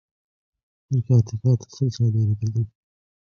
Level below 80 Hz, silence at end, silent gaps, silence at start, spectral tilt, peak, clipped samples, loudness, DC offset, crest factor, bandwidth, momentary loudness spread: -50 dBFS; 0.6 s; none; 0.9 s; -8.5 dB/octave; -6 dBFS; under 0.1%; -23 LUFS; under 0.1%; 16 dB; 6.8 kHz; 7 LU